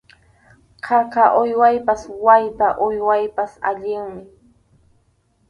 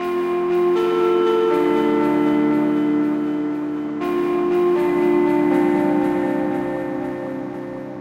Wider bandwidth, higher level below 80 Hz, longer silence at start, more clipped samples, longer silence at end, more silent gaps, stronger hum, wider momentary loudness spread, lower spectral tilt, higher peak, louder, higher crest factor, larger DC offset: second, 10 kHz vs 11.5 kHz; about the same, -54 dBFS vs -56 dBFS; first, 0.85 s vs 0 s; neither; first, 1.25 s vs 0 s; neither; neither; first, 13 LU vs 9 LU; second, -5.5 dB/octave vs -7.5 dB/octave; first, 0 dBFS vs -6 dBFS; about the same, -17 LUFS vs -19 LUFS; first, 18 dB vs 12 dB; neither